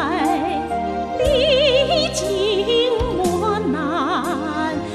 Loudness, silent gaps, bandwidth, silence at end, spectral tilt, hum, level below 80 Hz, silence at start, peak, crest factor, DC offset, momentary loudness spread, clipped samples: -19 LUFS; none; 14 kHz; 0 s; -4.5 dB/octave; none; -36 dBFS; 0 s; -4 dBFS; 14 dB; under 0.1%; 8 LU; under 0.1%